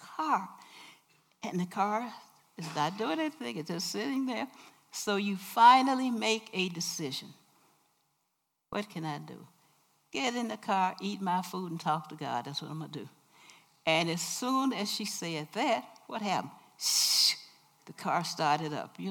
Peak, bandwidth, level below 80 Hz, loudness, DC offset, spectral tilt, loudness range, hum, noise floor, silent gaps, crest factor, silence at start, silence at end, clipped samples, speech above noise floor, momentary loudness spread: -8 dBFS; 18 kHz; -84 dBFS; -31 LUFS; under 0.1%; -3 dB/octave; 8 LU; none; -81 dBFS; none; 24 dB; 0 s; 0 s; under 0.1%; 49 dB; 16 LU